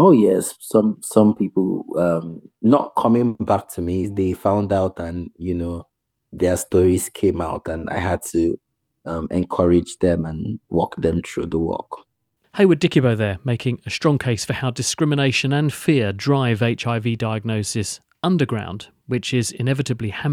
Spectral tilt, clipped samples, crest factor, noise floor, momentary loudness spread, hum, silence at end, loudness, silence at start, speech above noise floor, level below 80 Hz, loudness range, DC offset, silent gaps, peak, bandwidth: -6 dB/octave; under 0.1%; 20 dB; -66 dBFS; 10 LU; none; 0 s; -20 LUFS; 0 s; 47 dB; -46 dBFS; 3 LU; under 0.1%; none; 0 dBFS; 17 kHz